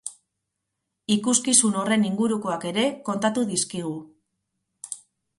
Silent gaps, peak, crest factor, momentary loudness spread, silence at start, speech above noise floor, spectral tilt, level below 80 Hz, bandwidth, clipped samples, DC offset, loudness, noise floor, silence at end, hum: none; -2 dBFS; 24 dB; 20 LU; 0.05 s; 58 dB; -3 dB/octave; -68 dBFS; 11.5 kHz; under 0.1%; under 0.1%; -23 LUFS; -81 dBFS; 0.4 s; none